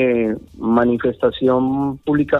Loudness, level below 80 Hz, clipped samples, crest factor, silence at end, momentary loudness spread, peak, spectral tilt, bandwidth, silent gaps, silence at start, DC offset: -18 LUFS; -46 dBFS; under 0.1%; 12 dB; 0 s; 5 LU; -4 dBFS; -9 dB/octave; 4.1 kHz; none; 0 s; under 0.1%